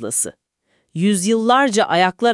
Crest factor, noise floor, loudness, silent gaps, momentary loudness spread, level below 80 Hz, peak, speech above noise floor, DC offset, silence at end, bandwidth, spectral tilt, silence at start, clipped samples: 16 dB; -66 dBFS; -17 LUFS; none; 8 LU; -68 dBFS; -2 dBFS; 50 dB; under 0.1%; 0 s; 12 kHz; -3.5 dB/octave; 0 s; under 0.1%